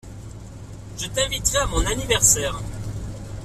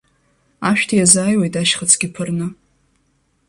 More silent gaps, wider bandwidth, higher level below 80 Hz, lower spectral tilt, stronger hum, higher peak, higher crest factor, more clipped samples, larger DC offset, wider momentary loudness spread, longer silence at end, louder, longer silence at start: neither; first, 16 kHz vs 14 kHz; first, -32 dBFS vs -54 dBFS; about the same, -2 dB/octave vs -3 dB/octave; neither; about the same, -2 dBFS vs 0 dBFS; about the same, 22 dB vs 18 dB; neither; neither; first, 23 LU vs 12 LU; second, 0 s vs 0.95 s; second, -21 LUFS vs -15 LUFS; second, 0.05 s vs 0.6 s